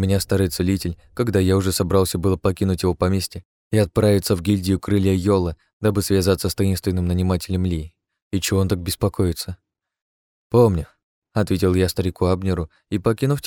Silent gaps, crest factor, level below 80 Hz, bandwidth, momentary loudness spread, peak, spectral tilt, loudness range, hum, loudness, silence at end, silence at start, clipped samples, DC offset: 3.45-3.70 s, 5.73-5.80 s, 8.22-8.31 s, 10.02-10.50 s, 11.03-11.22 s; 16 dB; -40 dBFS; 18.5 kHz; 9 LU; -4 dBFS; -6 dB/octave; 3 LU; none; -21 LUFS; 0 s; 0 s; under 0.1%; under 0.1%